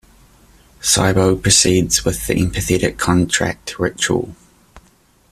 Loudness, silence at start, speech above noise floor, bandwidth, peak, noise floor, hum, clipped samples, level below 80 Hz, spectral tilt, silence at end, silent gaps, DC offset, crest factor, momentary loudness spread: -16 LUFS; 0.8 s; 37 dB; 15 kHz; 0 dBFS; -54 dBFS; none; under 0.1%; -36 dBFS; -3.5 dB/octave; 0.5 s; none; under 0.1%; 18 dB; 10 LU